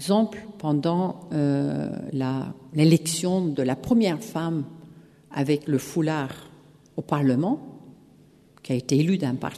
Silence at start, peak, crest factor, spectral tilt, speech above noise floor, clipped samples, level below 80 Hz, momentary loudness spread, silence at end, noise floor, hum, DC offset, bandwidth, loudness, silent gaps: 0 s; -6 dBFS; 20 dB; -6.5 dB/octave; 31 dB; under 0.1%; -60 dBFS; 10 LU; 0 s; -54 dBFS; none; under 0.1%; 13.5 kHz; -25 LUFS; none